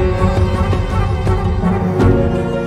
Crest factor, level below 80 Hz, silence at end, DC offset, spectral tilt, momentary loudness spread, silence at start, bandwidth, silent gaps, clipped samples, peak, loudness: 14 dB; -22 dBFS; 0 s; under 0.1%; -8 dB/octave; 4 LU; 0 s; 10 kHz; none; under 0.1%; 0 dBFS; -16 LUFS